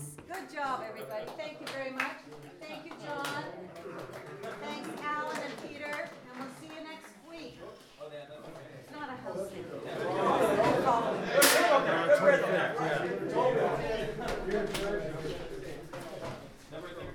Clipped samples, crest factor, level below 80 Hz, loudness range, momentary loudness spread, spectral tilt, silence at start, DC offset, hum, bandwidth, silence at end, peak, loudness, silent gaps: under 0.1%; 24 dB; -56 dBFS; 17 LU; 21 LU; -3.5 dB/octave; 0 s; under 0.1%; none; 19.5 kHz; 0 s; -10 dBFS; -31 LUFS; none